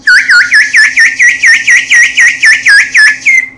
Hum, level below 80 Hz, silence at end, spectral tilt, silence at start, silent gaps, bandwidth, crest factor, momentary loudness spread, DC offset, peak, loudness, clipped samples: none; -50 dBFS; 0.1 s; 2.5 dB/octave; 0.05 s; none; 12 kHz; 6 dB; 2 LU; 0.2%; 0 dBFS; -3 LUFS; 5%